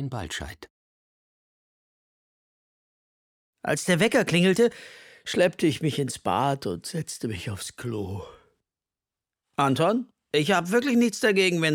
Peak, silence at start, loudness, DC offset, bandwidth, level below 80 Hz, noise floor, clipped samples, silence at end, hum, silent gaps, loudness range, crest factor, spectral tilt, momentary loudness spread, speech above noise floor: -8 dBFS; 0 s; -25 LUFS; under 0.1%; 17.5 kHz; -58 dBFS; under -90 dBFS; under 0.1%; 0 s; none; 0.70-3.53 s; 10 LU; 18 dB; -5 dB/octave; 14 LU; over 66 dB